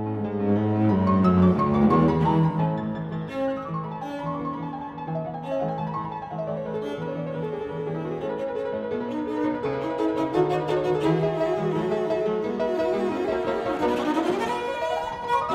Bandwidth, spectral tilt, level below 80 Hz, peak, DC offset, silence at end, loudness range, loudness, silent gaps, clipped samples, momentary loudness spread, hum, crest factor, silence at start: 11 kHz; -8 dB/octave; -52 dBFS; -8 dBFS; under 0.1%; 0 s; 8 LU; -25 LUFS; none; under 0.1%; 11 LU; none; 18 dB; 0 s